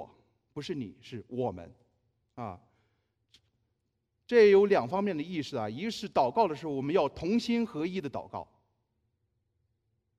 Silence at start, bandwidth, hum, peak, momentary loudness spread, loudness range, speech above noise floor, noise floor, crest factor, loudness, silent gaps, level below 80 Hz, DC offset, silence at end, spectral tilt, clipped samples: 0 s; 9.6 kHz; none; -12 dBFS; 20 LU; 14 LU; 51 dB; -80 dBFS; 20 dB; -29 LUFS; none; -66 dBFS; under 0.1%; 1.75 s; -6.5 dB/octave; under 0.1%